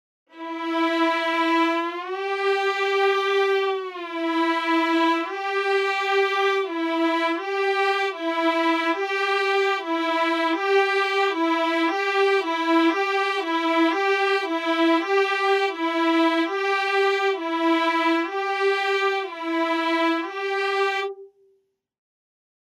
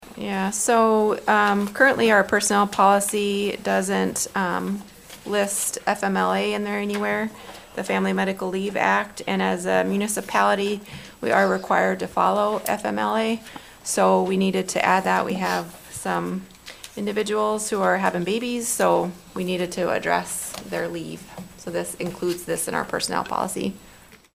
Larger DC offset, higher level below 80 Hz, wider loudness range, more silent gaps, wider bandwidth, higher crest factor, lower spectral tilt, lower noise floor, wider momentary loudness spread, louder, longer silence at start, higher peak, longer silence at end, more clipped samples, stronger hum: neither; second, under -90 dBFS vs -58 dBFS; second, 2 LU vs 7 LU; neither; second, 13 kHz vs 16 kHz; about the same, 14 dB vs 18 dB; second, -1 dB/octave vs -4 dB/octave; first, -67 dBFS vs -49 dBFS; second, 5 LU vs 12 LU; about the same, -22 LUFS vs -22 LUFS; first, 0.35 s vs 0 s; second, -10 dBFS vs -4 dBFS; first, 1.4 s vs 0.2 s; neither; neither